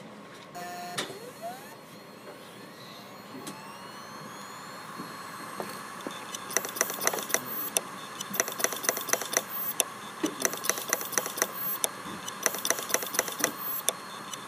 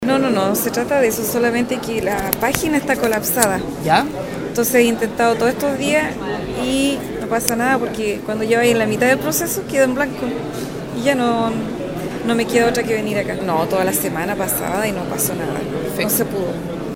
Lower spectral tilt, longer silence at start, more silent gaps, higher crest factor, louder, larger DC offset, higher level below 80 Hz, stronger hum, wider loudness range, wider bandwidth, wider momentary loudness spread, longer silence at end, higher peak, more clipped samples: second, -1 dB/octave vs -4 dB/octave; about the same, 0 s vs 0 s; neither; first, 34 dB vs 18 dB; second, -31 LUFS vs -18 LUFS; neither; second, -80 dBFS vs -44 dBFS; neither; first, 13 LU vs 2 LU; second, 15.5 kHz vs 17.5 kHz; first, 17 LU vs 8 LU; about the same, 0 s vs 0 s; about the same, 0 dBFS vs 0 dBFS; neither